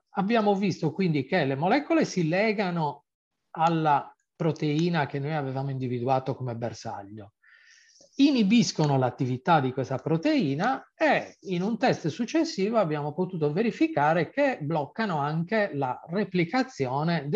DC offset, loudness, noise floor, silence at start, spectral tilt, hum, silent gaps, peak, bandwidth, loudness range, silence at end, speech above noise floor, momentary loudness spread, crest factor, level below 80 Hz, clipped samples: under 0.1%; -26 LUFS; -57 dBFS; 0.15 s; -6.5 dB/octave; none; 3.15-3.31 s; -10 dBFS; 7.8 kHz; 4 LU; 0 s; 31 dB; 8 LU; 18 dB; -72 dBFS; under 0.1%